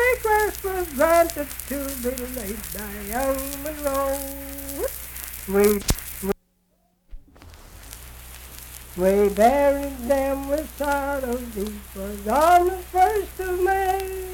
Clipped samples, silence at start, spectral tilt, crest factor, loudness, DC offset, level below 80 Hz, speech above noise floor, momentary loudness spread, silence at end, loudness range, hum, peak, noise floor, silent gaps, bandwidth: under 0.1%; 0 s; -4.5 dB/octave; 22 dB; -23 LUFS; under 0.1%; -40 dBFS; 43 dB; 15 LU; 0 s; 6 LU; none; -2 dBFS; -66 dBFS; none; 19 kHz